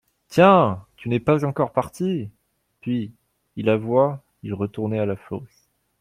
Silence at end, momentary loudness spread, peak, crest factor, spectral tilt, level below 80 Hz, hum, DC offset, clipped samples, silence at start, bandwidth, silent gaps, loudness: 0.55 s; 19 LU; -2 dBFS; 20 dB; -7.5 dB/octave; -58 dBFS; none; under 0.1%; under 0.1%; 0.3 s; 15.5 kHz; none; -22 LUFS